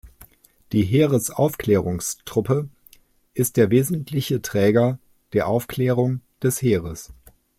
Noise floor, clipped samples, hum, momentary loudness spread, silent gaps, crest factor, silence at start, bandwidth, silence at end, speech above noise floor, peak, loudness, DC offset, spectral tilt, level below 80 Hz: -54 dBFS; under 0.1%; none; 8 LU; none; 18 dB; 0.05 s; 16.5 kHz; 0.45 s; 34 dB; -4 dBFS; -21 LUFS; under 0.1%; -6 dB/octave; -52 dBFS